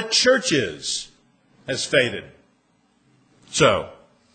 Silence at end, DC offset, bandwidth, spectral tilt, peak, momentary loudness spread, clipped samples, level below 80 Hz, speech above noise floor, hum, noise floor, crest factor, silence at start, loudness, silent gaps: 0.4 s; under 0.1%; 9.6 kHz; -2.5 dB/octave; -2 dBFS; 20 LU; under 0.1%; -56 dBFS; 43 dB; none; -63 dBFS; 20 dB; 0 s; -21 LUFS; none